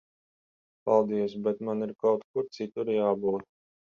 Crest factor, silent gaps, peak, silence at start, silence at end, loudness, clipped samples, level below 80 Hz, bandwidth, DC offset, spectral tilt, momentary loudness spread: 20 dB; 2.24-2.34 s; -10 dBFS; 0.85 s; 0.5 s; -29 LUFS; under 0.1%; -72 dBFS; 7 kHz; under 0.1%; -8 dB/octave; 9 LU